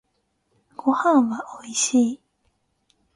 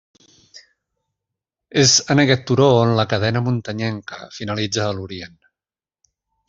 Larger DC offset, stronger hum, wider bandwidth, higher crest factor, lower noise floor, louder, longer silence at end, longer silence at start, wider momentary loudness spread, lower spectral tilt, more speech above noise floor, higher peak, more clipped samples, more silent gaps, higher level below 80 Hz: neither; neither; first, 11.5 kHz vs 7.8 kHz; about the same, 18 dB vs 18 dB; second, -71 dBFS vs under -90 dBFS; second, -21 LUFS vs -17 LUFS; second, 1 s vs 1.2 s; first, 0.85 s vs 0.55 s; second, 12 LU vs 18 LU; about the same, -3 dB/octave vs -4 dB/octave; second, 51 dB vs over 72 dB; second, -6 dBFS vs -2 dBFS; neither; neither; second, -70 dBFS vs -56 dBFS